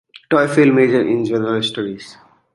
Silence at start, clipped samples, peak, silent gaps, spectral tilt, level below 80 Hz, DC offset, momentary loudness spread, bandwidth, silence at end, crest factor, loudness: 0.3 s; under 0.1%; -2 dBFS; none; -6 dB/octave; -60 dBFS; under 0.1%; 13 LU; 11.5 kHz; 0.4 s; 16 dB; -16 LUFS